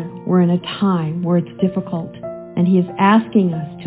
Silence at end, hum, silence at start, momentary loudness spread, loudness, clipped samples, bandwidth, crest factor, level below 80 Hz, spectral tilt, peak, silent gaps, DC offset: 0 s; none; 0 s; 12 LU; -17 LUFS; under 0.1%; 4 kHz; 16 dB; -56 dBFS; -12 dB/octave; -2 dBFS; none; under 0.1%